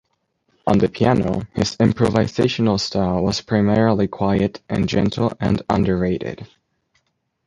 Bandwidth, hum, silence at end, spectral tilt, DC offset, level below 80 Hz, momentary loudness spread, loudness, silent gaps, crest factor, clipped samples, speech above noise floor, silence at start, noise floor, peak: 11 kHz; none; 1 s; -6.5 dB/octave; under 0.1%; -42 dBFS; 6 LU; -19 LUFS; none; 18 dB; under 0.1%; 50 dB; 0.65 s; -69 dBFS; -2 dBFS